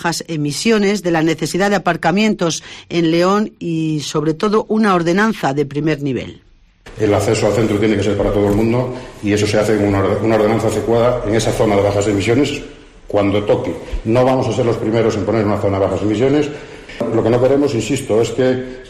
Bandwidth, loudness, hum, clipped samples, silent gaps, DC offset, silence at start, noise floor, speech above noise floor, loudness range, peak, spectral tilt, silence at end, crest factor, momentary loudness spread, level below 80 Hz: 14 kHz; -16 LUFS; none; under 0.1%; none; under 0.1%; 0 s; -41 dBFS; 26 dB; 2 LU; -4 dBFS; -6 dB/octave; 0 s; 12 dB; 7 LU; -38 dBFS